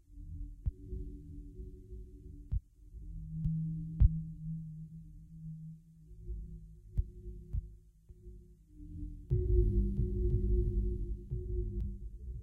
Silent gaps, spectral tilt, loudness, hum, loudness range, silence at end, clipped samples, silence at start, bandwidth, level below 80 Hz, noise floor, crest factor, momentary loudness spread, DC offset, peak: none; -12 dB/octave; -38 LUFS; none; 11 LU; 0 s; under 0.1%; 0.1 s; 0.7 kHz; -38 dBFS; -57 dBFS; 22 dB; 22 LU; under 0.1%; -14 dBFS